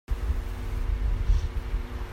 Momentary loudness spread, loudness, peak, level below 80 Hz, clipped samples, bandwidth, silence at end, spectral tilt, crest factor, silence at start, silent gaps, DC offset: 7 LU; -31 LUFS; -12 dBFS; -28 dBFS; under 0.1%; 9.6 kHz; 0 s; -6.5 dB/octave; 16 dB; 0.1 s; none; under 0.1%